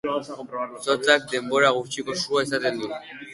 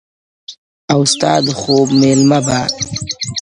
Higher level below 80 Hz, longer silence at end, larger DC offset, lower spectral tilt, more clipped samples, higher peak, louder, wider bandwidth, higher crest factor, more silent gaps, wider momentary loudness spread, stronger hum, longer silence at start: second, -66 dBFS vs -46 dBFS; about the same, 0 s vs 0 s; neither; second, -3 dB/octave vs -4.5 dB/octave; neither; second, -4 dBFS vs 0 dBFS; second, -23 LUFS vs -13 LUFS; about the same, 11.5 kHz vs 11 kHz; first, 20 dB vs 14 dB; second, none vs 0.58-0.88 s; about the same, 12 LU vs 10 LU; neither; second, 0.05 s vs 0.5 s